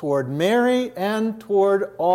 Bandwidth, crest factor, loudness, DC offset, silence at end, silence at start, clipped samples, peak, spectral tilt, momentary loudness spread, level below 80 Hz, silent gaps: 16 kHz; 14 dB; -21 LUFS; under 0.1%; 0 s; 0 s; under 0.1%; -6 dBFS; -6 dB/octave; 5 LU; -68 dBFS; none